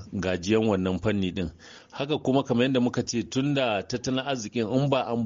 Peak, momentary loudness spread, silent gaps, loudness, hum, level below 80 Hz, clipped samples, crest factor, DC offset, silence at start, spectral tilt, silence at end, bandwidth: -10 dBFS; 7 LU; none; -26 LUFS; none; -54 dBFS; under 0.1%; 18 dB; under 0.1%; 0 s; -5 dB/octave; 0 s; 7.6 kHz